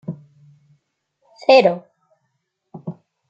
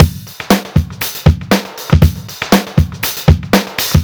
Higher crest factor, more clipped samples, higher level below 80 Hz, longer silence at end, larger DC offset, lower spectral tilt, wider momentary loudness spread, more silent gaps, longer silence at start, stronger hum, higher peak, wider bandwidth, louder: first, 20 dB vs 12 dB; second, under 0.1% vs 2%; second, -72 dBFS vs -22 dBFS; first, 0.4 s vs 0 s; neither; about the same, -5.5 dB/octave vs -5.5 dB/octave; first, 23 LU vs 5 LU; neither; about the same, 0.1 s vs 0 s; neither; about the same, -2 dBFS vs 0 dBFS; second, 7.6 kHz vs over 20 kHz; about the same, -15 LUFS vs -14 LUFS